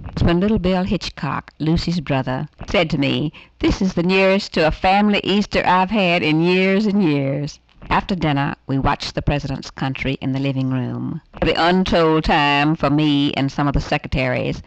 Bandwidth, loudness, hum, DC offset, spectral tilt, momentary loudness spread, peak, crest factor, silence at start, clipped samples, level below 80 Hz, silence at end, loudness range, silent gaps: 8.4 kHz; -18 LUFS; none; under 0.1%; -6.5 dB/octave; 8 LU; -6 dBFS; 12 dB; 0 s; under 0.1%; -34 dBFS; 0.05 s; 5 LU; none